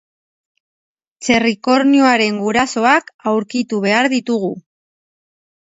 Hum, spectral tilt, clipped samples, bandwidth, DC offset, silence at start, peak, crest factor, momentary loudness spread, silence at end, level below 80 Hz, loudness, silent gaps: none; -4 dB/octave; under 0.1%; 8 kHz; under 0.1%; 1.2 s; 0 dBFS; 18 dB; 9 LU; 1.2 s; -56 dBFS; -15 LUFS; 3.14-3.19 s